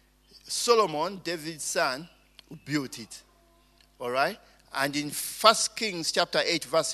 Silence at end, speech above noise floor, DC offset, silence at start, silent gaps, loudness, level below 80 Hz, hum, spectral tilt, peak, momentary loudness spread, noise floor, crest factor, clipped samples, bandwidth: 0 s; 34 dB; under 0.1%; 0.45 s; none; -27 LUFS; -66 dBFS; none; -2 dB/octave; -2 dBFS; 17 LU; -61 dBFS; 28 dB; under 0.1%; 13.5 kHz